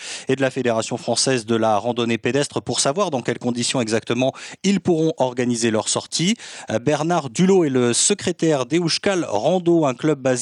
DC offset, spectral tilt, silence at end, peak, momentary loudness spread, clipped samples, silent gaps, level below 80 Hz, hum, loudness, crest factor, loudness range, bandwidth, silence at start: under 0.1%; -4 dB/octave; 0 s; -4 dBFS; 5 LU; under 0.1%; none; -64 dBFS; none; -20 LUFS; 16 dB; 2 LU; 12 kHz; 0 s